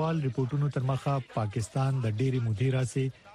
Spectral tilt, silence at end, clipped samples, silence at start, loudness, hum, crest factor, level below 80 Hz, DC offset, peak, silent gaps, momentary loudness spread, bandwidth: -7.5 dB/octave; 0 s; under 0.1%; 0 s; -30 LUFS; none; 12 dB; -58 dBFS; under 0.1%; -16 dBFS; none; 3 LU; 11.5 kHz